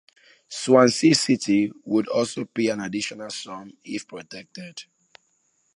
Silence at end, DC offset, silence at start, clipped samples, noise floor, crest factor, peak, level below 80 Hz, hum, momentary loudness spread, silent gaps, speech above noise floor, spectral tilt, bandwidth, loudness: 0.95 s; under 0.1%; 0.5 s; under 0.1%; -68 dBFS; 22 dB; -2 dBFS; -68 dBFS; none; 21 LU; none; 45 dB; -4.5 dB/octave; 11.5 kHz; -22 LUFS